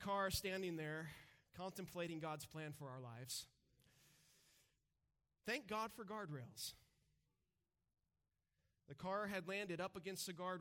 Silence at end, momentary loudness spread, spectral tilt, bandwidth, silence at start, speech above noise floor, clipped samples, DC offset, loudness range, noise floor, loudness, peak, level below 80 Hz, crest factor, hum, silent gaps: 0 s; 11 LU; -4 dB/octave; 17 kHz; 0 s; over 42 dB; under 0.1%; under 0.1%; 5 LU; under -90 dBFS; -48 LUFS; -30 dBFS; -72 dBFS; 20 dB; none; none